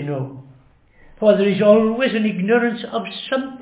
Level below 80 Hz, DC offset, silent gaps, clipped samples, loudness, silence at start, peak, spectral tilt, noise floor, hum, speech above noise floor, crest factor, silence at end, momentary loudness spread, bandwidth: -58 dBFS; under 0.1%; none; under 0.1%; -18 LUFS; 0 s; -2 dBFS; -10.5 dB/octave; -51 dBFS; none; 34 dB; 18 dB; 0 s; 12 LU; 4 kHz